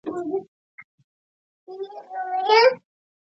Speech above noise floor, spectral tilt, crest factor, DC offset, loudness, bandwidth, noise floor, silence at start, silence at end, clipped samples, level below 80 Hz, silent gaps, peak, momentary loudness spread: over 69 dB; -3.5 dB/octave; 22 dB; under 0.1%; -21 LUFS; 7.6 kHz; under -90 dBFS; 0.05 s; 0.45 s; under 0.1%; -78 dBFS; 0.48-0.78 s, 0.84-0.98 s, 1.04-1.67 s; -4 dBFS; 20 LU